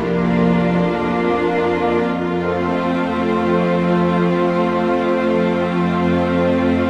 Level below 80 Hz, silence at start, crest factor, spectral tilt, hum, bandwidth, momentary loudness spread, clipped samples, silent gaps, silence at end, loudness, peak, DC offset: -44 dBFS; 0 s; 12 dB; -8 dB/octave; none; 7.8 kHz; 3 LU; under 0.1%; none; 0 s; -17 LUFS; -4 dBFS; 0.1%